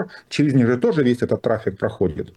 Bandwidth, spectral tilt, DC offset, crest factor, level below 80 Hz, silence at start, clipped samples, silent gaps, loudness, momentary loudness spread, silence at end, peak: 11.5 kHz; -7.5 dB/octave; under 0.1%; 12 dB; -50 dBFS; 0 s; under 0.1%; none; -20 LUFS; 7 LU; 0.05 s; -6 dBFS